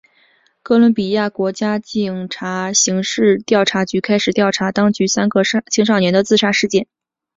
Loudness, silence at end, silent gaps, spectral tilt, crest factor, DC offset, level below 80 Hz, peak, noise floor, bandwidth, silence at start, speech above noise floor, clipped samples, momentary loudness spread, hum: -16 LUFS; 0.55 s; none; -4 dB/octave; 14 dB; under 0.1%; -58 dBFS; -2 dBFS; -56 dBFS; 7.8 kHz; 0.65 s; 41 dB; under 0.1%; 7 LU; none